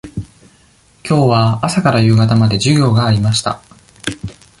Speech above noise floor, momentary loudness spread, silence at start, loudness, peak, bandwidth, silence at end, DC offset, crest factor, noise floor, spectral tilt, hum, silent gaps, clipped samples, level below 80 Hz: 38 dB; 18 LU; 0.05 s; -13 LUFS; -2 dBFS; 11.5 kHz; 0.3 s; under 0.1%; 14 dB; -50 dBFS; -6 dB/octave; none; none; under 0.1%; -40 dBFS